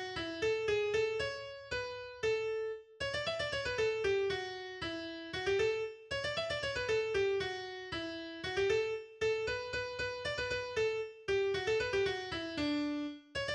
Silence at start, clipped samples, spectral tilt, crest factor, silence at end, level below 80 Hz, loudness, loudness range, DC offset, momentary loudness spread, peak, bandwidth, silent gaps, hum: 0 s; under 0.1%; -4 dB/octave; 16 dB; 0 s; -60 dBFS; -36 LUFS; 1 LU; under 0.1%; 8 LU; -20 dBFS; 10.5 kHz; none; none